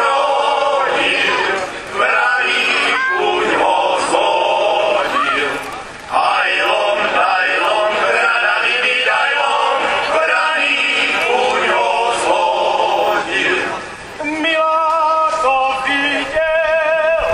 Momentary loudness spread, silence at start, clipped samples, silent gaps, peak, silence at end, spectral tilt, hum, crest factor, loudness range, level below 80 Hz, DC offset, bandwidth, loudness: 4 LU; 0 s; under 0.1%; none; 0 dBFS; 0 s; -2 dB/octave; none; 16 dB; 2 LU; -48 dBFS; under 0.1%; 14.5 kHz; -14 LUFS